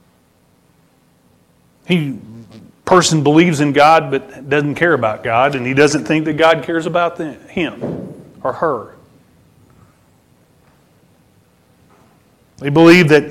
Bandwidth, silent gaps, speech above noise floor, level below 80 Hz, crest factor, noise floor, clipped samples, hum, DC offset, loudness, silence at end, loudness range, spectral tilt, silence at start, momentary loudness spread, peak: 14 kHz; none; 41 dB; -52 dBFS; 16 dB; -55 dBFS; under 0.1%; none; under 0.1%; -14 LUFS; 0 s; 13 LU; -5.5 dB/octave; 1.9 s; 16 LU; 0 dBFS